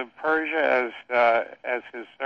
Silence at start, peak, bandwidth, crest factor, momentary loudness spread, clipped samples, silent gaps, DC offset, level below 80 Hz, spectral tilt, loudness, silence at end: 0 s; -8 dBFS; 6.6 kHz; 18 dB; 10 LU; under 0.1%; none; under 0.1%; -70 dBFS; -5 dB/octave; -24 LUFS; 0 s